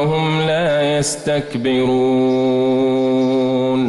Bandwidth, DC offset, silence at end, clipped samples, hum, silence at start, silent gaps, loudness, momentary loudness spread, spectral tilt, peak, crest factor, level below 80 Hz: 12 kHz; under 0.1%; 0 s; under 0.1%; none; 0 s; none; -16 LUFS; 3 LU; -5.5 dB/octave; -8 dBFS; 8 dB; -50 dBFS